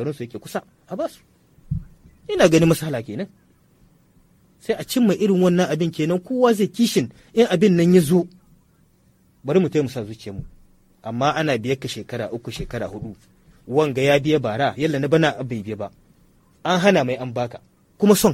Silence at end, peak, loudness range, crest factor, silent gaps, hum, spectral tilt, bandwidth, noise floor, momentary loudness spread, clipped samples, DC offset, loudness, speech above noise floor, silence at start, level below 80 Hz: 0 s; 0 dBFS; 6 LU; 20 dB; none; none; -6 dB/octave; 16.5 kHz; -58 dBFS; 16 LU; under 0.1%; under 0.1%; -20 LUFS; 38 dB; 0 s; -48 dBFS